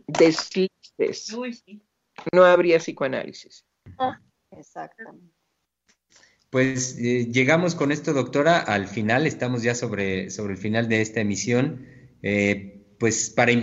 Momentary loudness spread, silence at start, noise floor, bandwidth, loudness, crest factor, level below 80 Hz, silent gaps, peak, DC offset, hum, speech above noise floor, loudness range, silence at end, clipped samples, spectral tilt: 14 LU; 0.1 s; -76 dBFS; 8 kHz; -23 LUFS; 20 dB; -64 dBFS; none; -4 dBFS; under 0.1%; none; 54 dB; 8 LU; 0 s; under 0.1%; -5 dB/octave